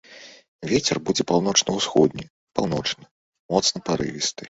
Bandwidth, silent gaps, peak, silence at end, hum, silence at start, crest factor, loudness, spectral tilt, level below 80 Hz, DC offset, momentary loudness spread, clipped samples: 8 kHz; 0.48-0.59 s, 2.30-2.47 s, 3.11-3.33 s, 3.39-3.49 s; -2 dBFS; 0 s; none; 0.1 s; 22 dB; -22 LUFS; -3.5 dB/octave; -54 dBFS; under 0.1%; 13 LU; under 0.1%